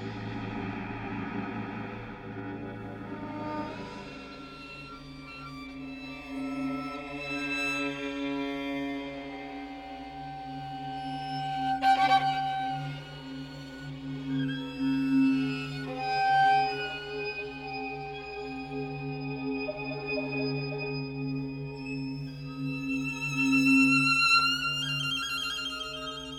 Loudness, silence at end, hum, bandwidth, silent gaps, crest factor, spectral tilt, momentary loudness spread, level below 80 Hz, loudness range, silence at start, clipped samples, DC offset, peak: -30 LUFS; 0 s; none; 15.5 kHz; none; 18 dB; -4.5 dB/octave; 18 LU; -56 dBFS; 14 LU; 0 s; under 0.1%; under 0.1%; -12 dBFS